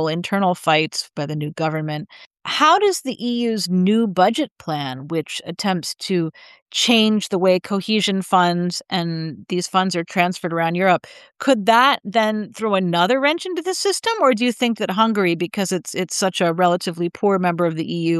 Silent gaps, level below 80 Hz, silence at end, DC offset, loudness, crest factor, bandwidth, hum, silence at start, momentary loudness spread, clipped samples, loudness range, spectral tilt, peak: 2.26-2.31 s, 6.62-6.66 s; -70 dBFS; 0 s; under 0.1%; -19 LUFS; 18 dB; 12.5 kHz; none; 0 s; 10 LU; under 0.1%; 3 LU; -4.5 dB/octave; -2 dBFS